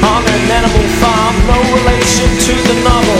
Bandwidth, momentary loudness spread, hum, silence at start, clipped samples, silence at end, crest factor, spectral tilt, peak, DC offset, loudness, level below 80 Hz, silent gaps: 16 kHz; 1 LU; none; 0 s; 0.1%; 0 s; 10 dB; -4 dB/octave; 0 dBFS; under 0.1%; -10 LUFS; -16 dBFS; none